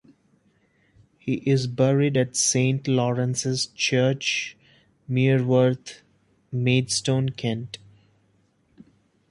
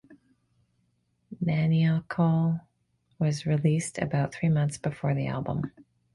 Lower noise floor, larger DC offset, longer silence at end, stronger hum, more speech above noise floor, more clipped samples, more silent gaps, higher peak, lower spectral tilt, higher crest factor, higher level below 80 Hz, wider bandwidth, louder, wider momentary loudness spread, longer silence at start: second, -65 dBFS vs -72 dBFS; neither; first, 1.55 s vs 0.45 s; neither; second, 42 dB vs 46 dB; neither; neither; first, -6 dBFS vs -12 dBFS; second, -5 dB/octave vs -7 dB/octave; about the same, 18 dB vs 16 dB; about the same, -62 dBFS vs -58 dBFS; about the same, 11.5 kHz vs 11.5 kHz; first, -23 LUFS vs -27 LUFS; first, 13 LU vs 8 LU; first, 1.25 s vs 0.1 s